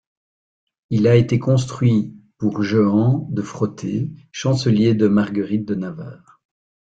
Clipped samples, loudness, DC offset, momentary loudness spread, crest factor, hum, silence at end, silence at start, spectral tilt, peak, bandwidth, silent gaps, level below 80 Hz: under 0.1%; -19 LUFS; under 0.1%; 11 LU; 16 dB; none; 0.75 s; 0.9 s; -7.5 dB/octave; -2 dBFS; 8 kHz; none; -54 dBFS